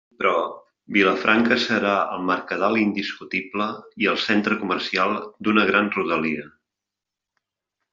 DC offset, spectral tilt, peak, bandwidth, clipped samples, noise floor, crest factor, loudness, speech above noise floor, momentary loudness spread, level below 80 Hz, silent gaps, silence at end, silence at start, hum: under 0.1%; -2.5 dB/octave; -4 dBFS; 7.4 kHz; under 0.1%; -86 dBFS; 20 dB; -22 LUFS; 64 dB; 9 LU; -64 dBFS; none; 1.45 s; 0.2 s; none